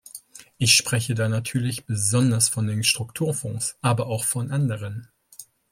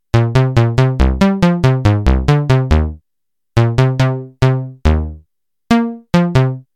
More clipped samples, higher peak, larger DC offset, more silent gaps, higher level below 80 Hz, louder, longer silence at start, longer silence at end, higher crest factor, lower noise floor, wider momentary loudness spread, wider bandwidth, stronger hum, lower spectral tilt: neither; about the same, -2 dBFS vs 0 dBFS; second, under 0.1% vs 0.4%; neither; second, -60 dBFS vs -22 dBFS; second, -22 LUFS vs -14 LUFS; about the same, 0.15 s vs 0.15 s; first, 0.3 s vs 0.15 s; first, 22 dB vs 14 dB; second, -48 dBFS vs -83 dBFS; first, 12 LU vs 4 LU; first, 16.5 kHz vs 9.4 kHz; neither; second, -3.5 dB/octave vs -7.5 dB/octave